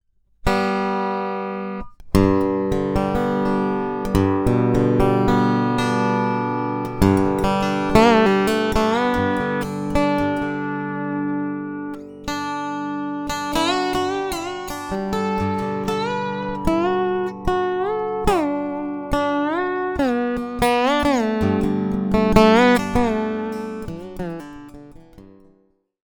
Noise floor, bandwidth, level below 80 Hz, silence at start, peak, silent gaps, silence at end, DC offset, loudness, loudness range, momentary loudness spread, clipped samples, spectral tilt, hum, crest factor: -61 dBFS; over 20 kHz; -36 dBFS; 0.45 s; 0 dBFS; none; 0.75 s; under 0.1%; -21 LUFS; 6 LU; 10 LU; under 0.1%; -6 dB/octave; 50 Hz at -50 dBFS; 20 dB